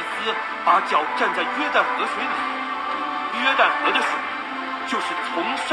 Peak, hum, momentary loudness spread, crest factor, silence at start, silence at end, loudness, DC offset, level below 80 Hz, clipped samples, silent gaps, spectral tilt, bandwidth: -4 dBFS; none; 8 LU; 18 dB; 0 s; 0 s; -22 LUFS; under 0.1%; -64 dBFS; under 0.1%; none; -2 dB/octave; 12.5 kHz